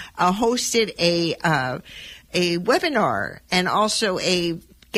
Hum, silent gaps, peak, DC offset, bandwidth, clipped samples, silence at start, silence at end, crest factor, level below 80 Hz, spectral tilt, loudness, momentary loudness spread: none; none; -6 dBFS; under 0.1%; 16 kHz; under 0.1%; 0 s; 0 s; 16 dB; -52 dBFS; -3.5 dB/octave; -21 LUFS; 9 LU